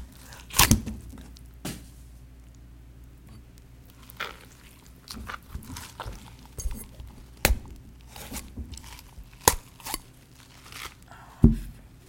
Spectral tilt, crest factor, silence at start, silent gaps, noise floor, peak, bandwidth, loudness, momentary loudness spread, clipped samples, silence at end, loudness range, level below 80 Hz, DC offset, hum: -3.5 dB/octave; 32 dB; 0 s; none; -51 dBFS; 0 dBFS; 17 kHz; -28 LUFS; 27 LU; under 0.1%; 0.1 s; 15 LU; -38 dBFS; under 0.1%; none